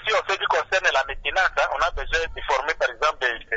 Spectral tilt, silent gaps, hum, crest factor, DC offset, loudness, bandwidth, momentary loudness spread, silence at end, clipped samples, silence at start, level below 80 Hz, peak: -1.5 dB/octave; none; none; 18 dB; under 0.1%; -22 LUFS; 8 kHz; 5 LU; 0 s; under 0.1%; 0 s; -40 dBFS; -6 dBFS